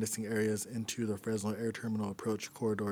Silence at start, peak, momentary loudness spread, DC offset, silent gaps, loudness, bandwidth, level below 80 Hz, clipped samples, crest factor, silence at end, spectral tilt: 0 s; -22 dBFS; 4 LU; under 0.1%; none; -36 LUFS; over 20 kHz; -72 dBFS; under 0.1%; 14 dB; 0 s; -5 dB/octave